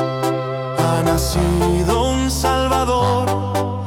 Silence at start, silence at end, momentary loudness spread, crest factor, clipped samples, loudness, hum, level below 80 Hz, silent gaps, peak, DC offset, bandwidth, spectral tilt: 0 s; 0 s; 4 LU; 14 dB; under 0.1%; -18 LUFS; none; -28 dBFS; none; -4 dBFS; under 0.1%; 18 kHz; -5.5 dB/octave